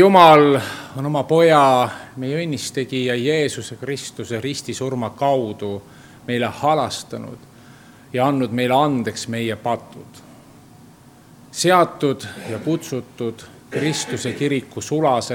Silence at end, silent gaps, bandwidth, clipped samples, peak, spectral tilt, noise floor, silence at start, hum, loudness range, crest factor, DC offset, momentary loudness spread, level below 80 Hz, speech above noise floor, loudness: 0 s; none; 18 kHz; under 0.1%; 0 dBFS; -5 dB/octave; -46 dBFS; 0 s; none; 5 LU; 20 dB; under 0.1%; 15 LU; -62 dBFS; 28 dB; -19 LUFS